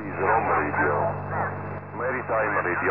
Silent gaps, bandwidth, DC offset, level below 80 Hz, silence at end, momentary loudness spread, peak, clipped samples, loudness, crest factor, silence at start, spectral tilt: none; 4.5 kHz; 0.4%; -56 dBFS; 0 s; 8 LU; -10 dBFS; under 0.1%; -25 LUFS; 16 dB; 0 s; -12.5 dB/octave